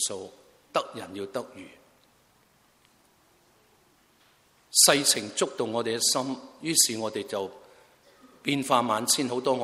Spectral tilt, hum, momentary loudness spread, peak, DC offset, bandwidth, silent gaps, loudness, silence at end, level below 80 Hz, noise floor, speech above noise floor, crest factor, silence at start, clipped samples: -1.5 dB/octave; none; 19 LU; -4 dBFS; under 0.1%; 16 kHz; none; -25 LUFS; 0 s; -74 dBFS; -63 dBFS; 37 dB; 26 dB; 0 s; under 0.1%